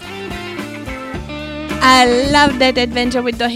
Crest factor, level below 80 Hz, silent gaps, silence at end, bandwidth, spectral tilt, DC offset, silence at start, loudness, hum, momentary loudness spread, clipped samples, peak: 14 dB; -34 dBFS; none; 0 s; 16.5 kHz; -3.5 dB/octave; under 0.1%; 0 s; -12 LUFS; none; 16 LU; under 0.1%; 0 dBFS